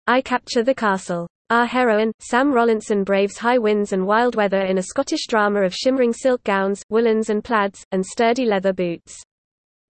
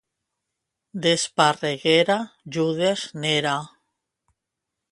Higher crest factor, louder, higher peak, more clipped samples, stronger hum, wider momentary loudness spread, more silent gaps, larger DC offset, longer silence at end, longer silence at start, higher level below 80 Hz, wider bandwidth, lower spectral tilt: second, 14 dB vs 22 dB; first, -19 LUFS vs -22 LUFS; about the same, -4 dBFS vs -4 dBFS; neither; neither; second, 5 LU vs 8 LU; first, 1.30-1.45 s, 2.14-2.19 s, 6.83-6.89 s, 7.85-7.91 s vs none; neither; second, 0.7 s vs 1.25 s; second, 0.05 s vs 0.95 s; first, -58 dBFS vs -68 dBFS; second, 8.8 kHz vs 11.5 kHz; first, -5 dB/octave vs -3.5 dB/octave